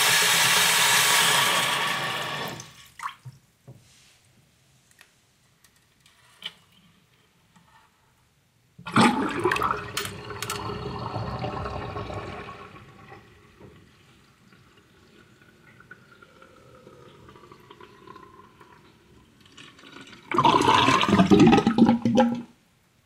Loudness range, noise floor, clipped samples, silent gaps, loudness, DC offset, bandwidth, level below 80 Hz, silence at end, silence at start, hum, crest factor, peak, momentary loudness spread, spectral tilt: 27 LU; -64 dBFS; under 0.1%; none; -21 LUFS; under 0.1%; 16 kHz; -54 dBFS; 0.6 s; 0 s; none; 22 dB; -4 dBFS; 22 LU; -3 dB/octave